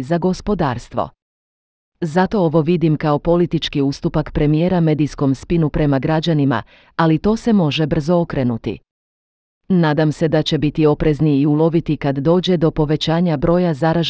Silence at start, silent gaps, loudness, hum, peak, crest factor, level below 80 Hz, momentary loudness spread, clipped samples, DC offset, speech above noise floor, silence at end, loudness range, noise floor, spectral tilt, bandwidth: 0 s; 1.22-1.92 s, 8.91-9.61 s; -17 LUFS; none; -2 dBFS; 14 dB; -38 dBFS; 5 LU; under 0.1%; under 0.1%; over 74 dB; 0 s; 3 LU; under -90 dBFS; -7.5 dB/octave; 8 kHz